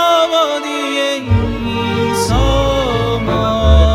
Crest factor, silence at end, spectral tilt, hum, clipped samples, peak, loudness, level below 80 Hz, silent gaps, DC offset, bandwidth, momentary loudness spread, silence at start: 14 dB; 0 s; -5.5 dB/octave; none; under 0.1%; 0 dBFS; -15 LUFS; -18 dBFS; none; under 0.1%; 14.5 kHz; 6 LU; 0 s